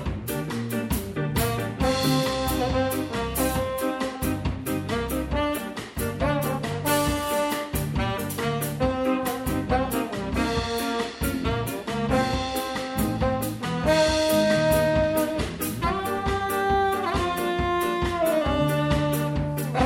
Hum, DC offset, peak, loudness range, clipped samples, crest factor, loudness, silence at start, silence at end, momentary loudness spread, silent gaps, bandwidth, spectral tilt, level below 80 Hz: none; under 0.1%; -8 dBFS; 3 LU; under 0.1%; 16 dB; -25 LUFS; 0 s; 0 s; 7 LU; none; 17 kHz; -5 dB/octave; -38 dBFS